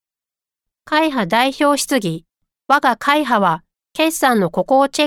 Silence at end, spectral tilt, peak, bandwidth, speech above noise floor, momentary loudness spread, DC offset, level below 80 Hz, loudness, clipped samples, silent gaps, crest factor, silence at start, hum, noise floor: 0 s; -4 dB/octave; -2 dBFS; 17.5 kHz; 73 dB; 6 LU; under 0.1%; -56 dBFS; -16 LUFS; under 0.1%; none; 14 dB; 0.9 s; none; -89 dBFS